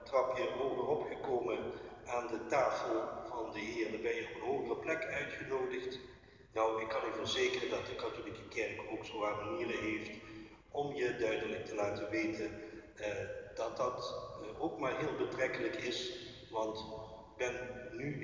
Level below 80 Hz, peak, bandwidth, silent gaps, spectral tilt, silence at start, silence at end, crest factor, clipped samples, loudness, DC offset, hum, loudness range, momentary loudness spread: -64 dBFS; -20 dBFS; 7.6 kHz; none; -4.5 dB/octave; 0 s; 0 s; 18 dB; under 0.1%; -39 LUFS; under 0.1%; none; 2 LU; 10 LU